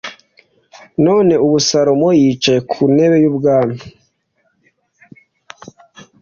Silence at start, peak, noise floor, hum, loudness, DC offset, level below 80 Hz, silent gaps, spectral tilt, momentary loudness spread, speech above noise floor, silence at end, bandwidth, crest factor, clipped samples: 0.05 s; -2 dBFS; -64 dBFS; none; -13 LUFS; under 0.1%; -54 dBFS; none; -5.5 dB/octave; 9 LU; 51 dB; 0.2 s; 7.4 kHz; 14 dB; under 0.1%